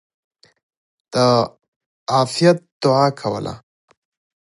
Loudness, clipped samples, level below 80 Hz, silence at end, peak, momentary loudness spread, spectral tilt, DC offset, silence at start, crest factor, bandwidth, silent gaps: -18 LUFS; under 0.1%; -58 dBFS; 0.9 s; -2 dBFS; 14 LU; -5.5 dB/octave; under 0.1%; 1.15 s; 18 dB; 11.5 kHz; 1.68-2.06 s, 2.72-2.80 s